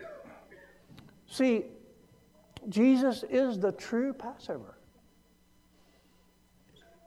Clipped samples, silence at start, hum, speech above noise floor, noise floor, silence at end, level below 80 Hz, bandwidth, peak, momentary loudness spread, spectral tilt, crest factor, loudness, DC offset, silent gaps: under 0.1%; 0 s; none; 36 dB; -65 dBFS; 2.35 s; -70 dBFS; 13 kHz; -14 dBFS; 21 LU; -6 dB/octave; 18 dB; -30 LUFS; under 0.1%; none